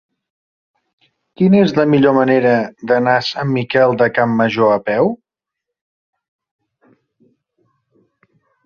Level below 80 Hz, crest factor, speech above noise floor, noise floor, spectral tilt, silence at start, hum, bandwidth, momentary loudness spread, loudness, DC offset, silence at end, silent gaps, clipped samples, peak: -58 dBFS; 16 dB; 68 dB; -81 dBFS; -7.5 dB/octave; 1.4 s; none; 6.8 kHz; 6 LU; -14 LUFS; under 0.1%; 3.5 s; none; under 0.1%; -2 dBFS